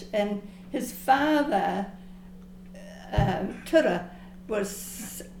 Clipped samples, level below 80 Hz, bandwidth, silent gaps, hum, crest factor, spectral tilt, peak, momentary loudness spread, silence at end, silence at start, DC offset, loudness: under 0.1%; -44 dBFS; 19 kHz; none; none; 20 dB; -5.5 dB/octave; -8 dBFS; 23 LU; 0 s; 0 s; under 0.1%; -27 LUFS